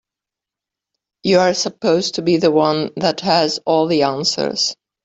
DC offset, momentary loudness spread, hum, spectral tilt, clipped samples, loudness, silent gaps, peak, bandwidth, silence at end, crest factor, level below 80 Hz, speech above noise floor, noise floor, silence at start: under 0.1%; 5 LU; none; -4 dB/octave; under 0.1%; -17 LUFS; none; -2 dBFS; 8.4 kHz; 0.3 s; 16 dB; -58 dBFS; 70 dB; -86 dBFS; 1.25 s